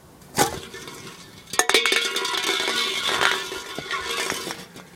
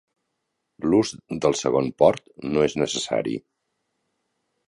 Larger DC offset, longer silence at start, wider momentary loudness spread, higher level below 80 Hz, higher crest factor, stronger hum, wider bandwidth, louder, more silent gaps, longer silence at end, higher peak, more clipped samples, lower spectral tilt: neither; second, 0.05 s vs 0.8 s; first, 19 LU vs 10 LU; about the same, -58 dBFS vs -56 dBFS; about the same, 26 dB vs 22 dB; neither; first, 17 kHz vs 11.5 kHz; about the same, -22 LUFS vs -23 LUFS; neither; second, 0 s vs 1.3 s; about the same, 0 dBFS vs -2 dBFS; neither; second, -1 dB/octave vs -5 dB/octave